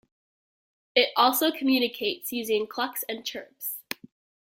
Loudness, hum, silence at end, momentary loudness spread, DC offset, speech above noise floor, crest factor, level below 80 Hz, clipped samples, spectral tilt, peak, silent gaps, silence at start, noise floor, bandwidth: -26 LUFS; none; 0.7 s; 14 LU; under 0.1%; over 64 dB; 22 dB; -76 dBFS; under 0.1%; -1.5 dB/octave; -6 dBFS; none; 0.95 s; under -90 dBFS; 17 kHz